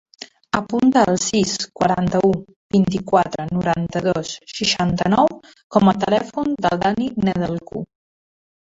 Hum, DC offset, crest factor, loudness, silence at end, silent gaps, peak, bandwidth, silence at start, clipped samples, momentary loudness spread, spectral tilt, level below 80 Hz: none; under 0.1%; 18 dB; -19 LUFS; 0.9 s; 2.56-2.70 s, 5.64-5.70 s; -2 dBFS; 8 kHz; 0.2 s; under 0.1%; 9 LU; -5 dB/octave; -48 dBFS